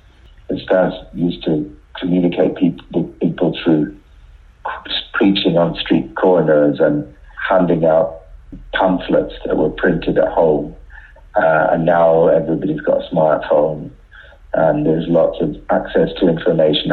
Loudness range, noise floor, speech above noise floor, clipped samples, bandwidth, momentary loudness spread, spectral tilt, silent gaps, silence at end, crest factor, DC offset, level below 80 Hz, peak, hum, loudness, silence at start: 3 LU; -43 dBFS; 28 dB; under 0.1%; 4.6 kHz; 10 LU; -9 dB/octave; none; 0 s; 12 dB; under 0.1%; -40 dBFS; -4 dBFS; none; -16 LUFS; 0.5 s